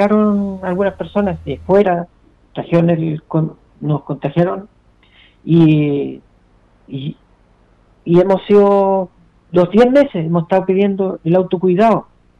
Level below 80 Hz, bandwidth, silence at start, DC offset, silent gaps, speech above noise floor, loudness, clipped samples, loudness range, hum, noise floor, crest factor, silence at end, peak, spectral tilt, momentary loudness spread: -48 dBFS; 6.8 kHz; 0 s; under 0.1%; none; 38 dB; -15 LUFS; under 0.1%; 5 LU; none; -51 dBFS; 12 dB; 0.35 s; -2 dBFS; -9.5 dB/octave; 16 LU